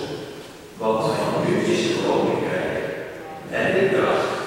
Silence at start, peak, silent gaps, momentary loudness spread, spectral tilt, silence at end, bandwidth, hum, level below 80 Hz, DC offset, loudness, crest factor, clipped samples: 0 s; -6 dBFS; none; 15 LU; -5.5 dB/octave; 0 s; 16 kHz; none; -56 dBFS; under 0.1%; -22 LUFS; 16 dB; under 0.1%